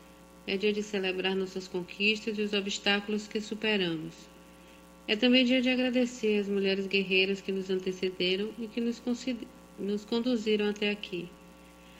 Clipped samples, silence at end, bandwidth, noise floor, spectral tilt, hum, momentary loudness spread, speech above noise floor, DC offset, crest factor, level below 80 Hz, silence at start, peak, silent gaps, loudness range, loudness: under 0.1%; 0 s; 16 kHz; -53 dBFS; -4.5 dB/octave; none; 12 LU; 23 dB; under 0.1%; 20 dB; -64 dBFS; 0 s; -10 dBFS; none; 5 LU; -30 LUFS